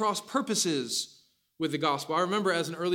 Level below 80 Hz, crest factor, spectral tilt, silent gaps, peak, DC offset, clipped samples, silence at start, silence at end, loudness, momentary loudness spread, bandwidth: -78 dBFS; 16 dB; -3 dB/octave; none; -14 dBFS; under 0.1%; under 0.1%; 0 s; 0 s; -29 LUFS; 6 LU; 17 kHz